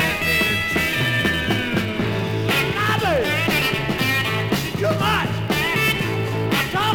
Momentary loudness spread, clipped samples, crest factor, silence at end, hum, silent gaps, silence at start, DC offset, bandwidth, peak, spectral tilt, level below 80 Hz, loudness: 4 LU; under 0.1%; 16 dB; 0 s; none; none; 0 s; under 0.1%; 19.5 kHz; -4 dBFS; -4.5 dB/octave; -44 dBFS; -20 LUFS